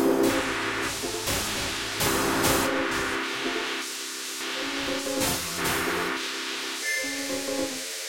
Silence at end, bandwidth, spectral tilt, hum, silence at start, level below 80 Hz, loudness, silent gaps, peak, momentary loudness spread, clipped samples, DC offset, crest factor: 0 s; 16.5 kHz; -2.5 dB/octave; none; 0 s; -50 dBFS; -27 LUFS; none; -10 dBFS; 7 LU; under 0.1%; under 0.1%; 18 dB